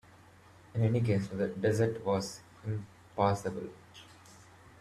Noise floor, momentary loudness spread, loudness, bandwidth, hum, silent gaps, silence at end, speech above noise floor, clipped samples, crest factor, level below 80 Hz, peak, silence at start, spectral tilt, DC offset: -58 dBFS; 19 LU; -33 LUFS; 13.5 kHz; none; none; 0.35 s; 27 dB; under 0.1%; 18 dB; -64 dBFS; -14 dBFS; 0.75 s; -7 dB/octave; under 0.1%